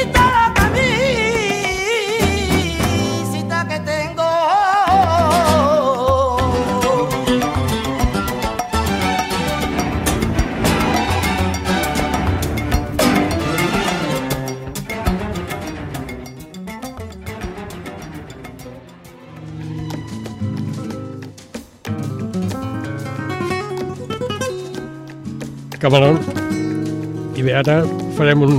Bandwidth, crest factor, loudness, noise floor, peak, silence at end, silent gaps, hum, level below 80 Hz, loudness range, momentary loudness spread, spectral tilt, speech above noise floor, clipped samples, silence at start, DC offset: 16 kHz; 18 dB; -18 LUFS; -39 dBFS; 0 dBFS; 0 s; none; none; -32 dBFS; 14 LU; 17 LU; -5 dB/octave; 27 dB; under 0.1%; 0 s; under 0.1%